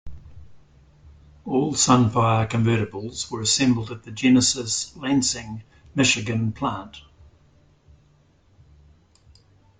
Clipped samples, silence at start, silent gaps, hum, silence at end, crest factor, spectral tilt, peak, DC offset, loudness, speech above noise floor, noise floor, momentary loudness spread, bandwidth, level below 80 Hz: under 0.1%; 0.05 s; none; none; 2.8 s; 20 dB; -4 dB/octave; -4 dBFS; under 0.1%; -22 LUFS; 37 dB; -58 dBFS; 15 LU; 9.6 kHz; -52 dBFS